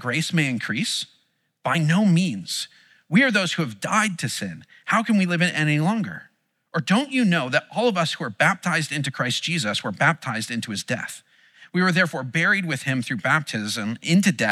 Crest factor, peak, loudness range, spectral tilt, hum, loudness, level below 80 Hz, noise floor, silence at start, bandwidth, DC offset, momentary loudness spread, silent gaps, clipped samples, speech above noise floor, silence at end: 18 dB; -6 dBFS; 2 LU; -4.5 dB/octave; none; -22 LUFS; -78 dBFS; -46 dBFS; 0 s; 14.5 kHz; under 0.1%; 9 LU; none; under 0.1%; 23 dB; 0 s